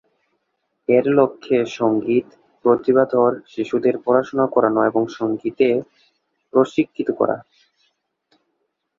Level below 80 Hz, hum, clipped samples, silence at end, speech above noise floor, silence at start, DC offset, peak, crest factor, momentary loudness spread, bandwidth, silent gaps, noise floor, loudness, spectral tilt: -64 dBFS; none; under 0.1%; 1.6 s; 55 dB; 0.9 s; under 0.1%; -2 dBFS; 18 dB; 7 LU; 7.4 kHz; none; -73 dBFS; -19 LUFS; -7.5 dB/octave